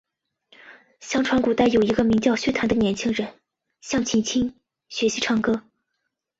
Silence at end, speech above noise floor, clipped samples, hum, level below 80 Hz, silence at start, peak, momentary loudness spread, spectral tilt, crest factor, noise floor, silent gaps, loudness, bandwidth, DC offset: 0.8 s; 57 dB; under 0.1%; none; -50 dBFS; 0.65 s; -6 dBFS; 10 LU; -4.5 dB/octave; 18 dB; -79 dBFS; none; -22 LUFS; 8 kHz; under 0.1%